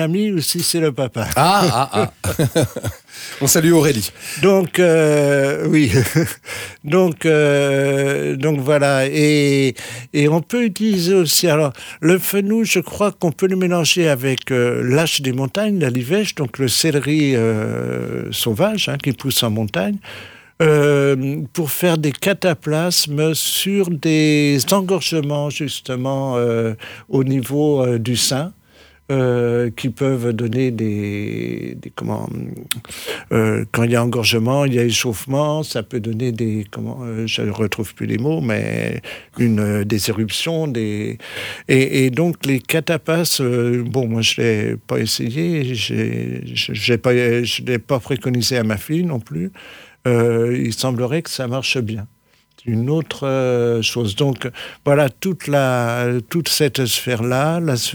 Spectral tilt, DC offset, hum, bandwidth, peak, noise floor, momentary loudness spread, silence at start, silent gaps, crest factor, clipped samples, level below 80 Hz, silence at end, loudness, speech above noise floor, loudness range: -5 dB/octave; under 0.1%; none; over 20 kHz; -2 dBFS; -54 dBFS; 10 LU; 0 s; none; 16 dB; under 0.1%; -52 dBFS; 0 s; -18 LUFS; 36 dB; 5 LU